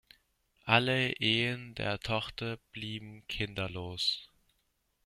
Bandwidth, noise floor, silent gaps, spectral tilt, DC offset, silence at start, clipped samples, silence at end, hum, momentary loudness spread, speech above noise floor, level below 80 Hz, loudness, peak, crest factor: 15 kHz; -77 dBFS; none; -5 dB/octave; under 0.1%; 0.65 s; under 0.1%; 0.8 s; none; 14 LU; 44 dB; -58 dBFS; -32 LUFS; -6 dBFS; 28 dB